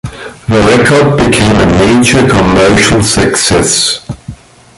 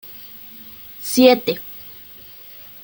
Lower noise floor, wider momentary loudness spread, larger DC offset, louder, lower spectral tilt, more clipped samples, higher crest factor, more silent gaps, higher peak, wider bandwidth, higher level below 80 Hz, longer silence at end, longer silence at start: second, -29 dBFS vs -41 dBFS; second, 11 LU vs 23 LU; neither; first, -7 LUFS vs -17 LUFS; about the same, -4 dB/octave vs -3.5 dB/octave; neither; second, 8 dB vs 20 dB; neither; about the same, 0 dBFS vs 0 dBFS; second, 12 kHz vs 17 kHz; first, -26 dBFS vs -62 dBFS; second, 0.45 s vs 0.9 s; about the same, 0.05 s vs 0.1 s